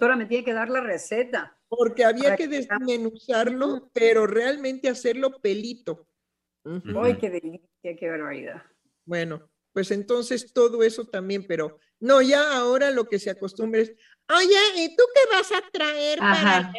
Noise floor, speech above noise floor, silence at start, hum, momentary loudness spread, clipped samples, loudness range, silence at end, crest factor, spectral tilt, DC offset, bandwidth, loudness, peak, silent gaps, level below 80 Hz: -82 dBFS; 60 dB; 0 s; none; 15 LU; under 0.1%; 9 LU; 0 s; 18 dB; -4 dB/octave; under 0.1%; 12 kHz; -23 LUFS; -4 dBFS; none; -72 dBFS